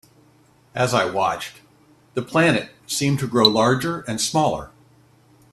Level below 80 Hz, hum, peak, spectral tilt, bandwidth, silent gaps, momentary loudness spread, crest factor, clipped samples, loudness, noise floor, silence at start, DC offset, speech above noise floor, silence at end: -56 dBFS; none; 0 dBFS; -4 dB/octave; 14.5 kHz; none; 14 LU; 22 dB; under 0.1%; -20 LUFS; -55 dBFS; 0.75 s; under 0.1%; 35 dB; 0.85 s